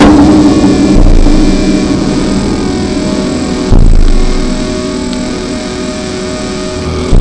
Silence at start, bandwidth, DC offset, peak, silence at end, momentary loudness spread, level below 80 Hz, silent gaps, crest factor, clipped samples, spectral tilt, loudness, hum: 0 s; 10 kHz; under 0.1%; 0 dBFS; 0 s; 10 LU; -12 dBFS; none; 8 dB; 0.4%; -6 dB/octave; -10 LUFS; none